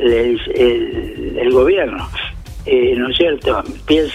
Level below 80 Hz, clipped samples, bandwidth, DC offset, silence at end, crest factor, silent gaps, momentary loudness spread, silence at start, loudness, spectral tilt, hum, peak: -32 dBFS; under 0.1%; 10 kHz; under 0.1%; 0 s; 14 dB; none; 11 LU; 0 s; -16 LUFS; -6 dB/octave; none; 0 dBFS